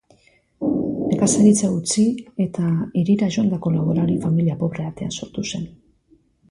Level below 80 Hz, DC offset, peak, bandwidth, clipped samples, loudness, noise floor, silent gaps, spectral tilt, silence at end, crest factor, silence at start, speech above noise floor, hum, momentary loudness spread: -52 dBFS; under 0.1%; -4 dBFS; 11.5 kHz; under 0.1%; -20 LUFS; -58 dBFS; none; -6 dB/octave; 0.8 s; 16 dB; 0.6 s; 39 dB; none; 13 LU